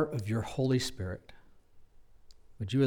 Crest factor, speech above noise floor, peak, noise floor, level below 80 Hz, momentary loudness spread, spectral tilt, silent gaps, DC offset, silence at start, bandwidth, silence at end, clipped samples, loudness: 16 dB; 24 dB; -18 dBFS; -55 dBFS; -58 dBFS; 12 LU; -6 dB/octave; none; under 0.1%; 0 s; 17 kHz; 0 s; under 0.1%; -34 LUFS